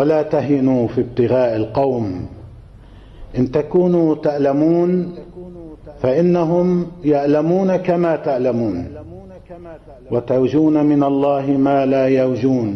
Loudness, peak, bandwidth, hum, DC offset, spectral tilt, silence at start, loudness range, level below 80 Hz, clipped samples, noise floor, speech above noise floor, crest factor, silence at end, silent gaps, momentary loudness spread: -17 LUFS; -6 dBFS; 6.4 kHz; none; under 0.1%; -9.5 dB/octave; 0 s; 3 LU; -46 dBFS; under 0.1%; -40 dBFS; 24 dB; 10 dB; 0 s; none; 18 LU